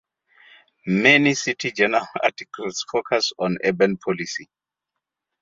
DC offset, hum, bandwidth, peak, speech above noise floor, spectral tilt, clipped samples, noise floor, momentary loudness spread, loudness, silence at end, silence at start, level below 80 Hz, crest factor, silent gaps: under 0.1%; none; 7.8 kHz; -2 dBFS; 62 dB; -4 dB/octave; under 0.1%; -84 dBFS; 15 LU; -20 LUFS; 0.95 s; 0.85 s; -64 dBFS; 22 dB; none